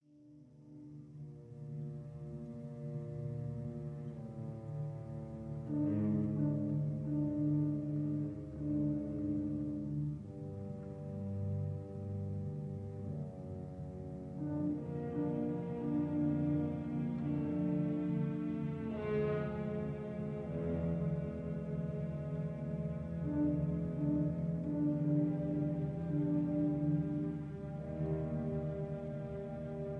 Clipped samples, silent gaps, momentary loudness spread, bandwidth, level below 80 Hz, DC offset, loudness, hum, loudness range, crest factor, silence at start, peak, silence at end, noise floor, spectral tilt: under 0.1%; none; 11 LU; 3.8 kHz; -58 dBFS; under 0.1%; -38 LUFS; none; 8 LU; 14 dB; 0.15 s; -24 dBFS; 0 s; -60 dBFS; -11 dB/octave